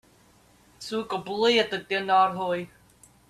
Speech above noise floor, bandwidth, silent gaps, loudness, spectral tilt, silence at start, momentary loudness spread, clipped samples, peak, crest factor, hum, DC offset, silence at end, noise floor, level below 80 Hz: 34 dB; 13.5 kHz; none; -25 LUFS; -4 dB/octave; 0.8 s; 11 LU; under 0.1%; -8 dBFS; 18 dB; none; under 0.1%; 0.65 s; -59 dBFS; -66 dBFS